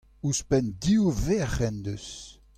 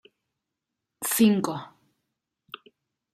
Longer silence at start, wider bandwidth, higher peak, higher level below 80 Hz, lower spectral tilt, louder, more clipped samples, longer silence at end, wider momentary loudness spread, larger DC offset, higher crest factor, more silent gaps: second, 0.25 s vs 1 s; about the same, 15 kHz vs 16 kHz; about the same, -12 dBFS vs -10 dBFS; first, -40 dBFS vs -74 dBFS; about the same, -5.5 dB/octave vs -4.5 dB/octave; second, -27 LUFS vs -24 LUFS; neither; second, 0.25 s vs 1.45 s; second, 14 LU vs 24 LU; neither; about the same, 16 dB vs 20 dB; neither